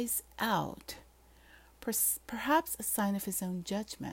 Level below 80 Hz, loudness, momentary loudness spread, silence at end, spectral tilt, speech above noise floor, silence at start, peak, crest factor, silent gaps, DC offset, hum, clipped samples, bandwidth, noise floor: -62 dBFS; -33 LUFS; 13 LU; 0 s; -3.5 dB/octave; 26 dB; 0 s; -16 dBFS; 18 dB; none; under 0.1%; none; under 0.1%; 16.5 kHz; -60 dBFS